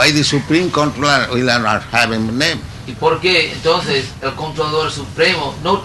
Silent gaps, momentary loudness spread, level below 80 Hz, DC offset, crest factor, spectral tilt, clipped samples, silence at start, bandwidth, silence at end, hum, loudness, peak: none; 8 LU; -40 dBFS; under 0.1%; 14 dB; -4 dB/octave; under 0.1%; 0 s; 12 kHz; 0 s; none; -15 LUFS; 0 dBFS